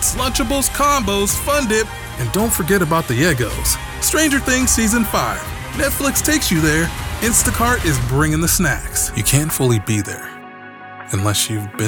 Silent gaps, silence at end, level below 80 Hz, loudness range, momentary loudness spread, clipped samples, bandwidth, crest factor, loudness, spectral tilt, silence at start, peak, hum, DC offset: none; 0 s; -30 dBFS; 2 LU; 10 LU; under 0.1%; over 20 kHz; 18 dB; -16 LUFS; -3.5 dB/octave; 0 s; 0 dBFS; none; under 0.1%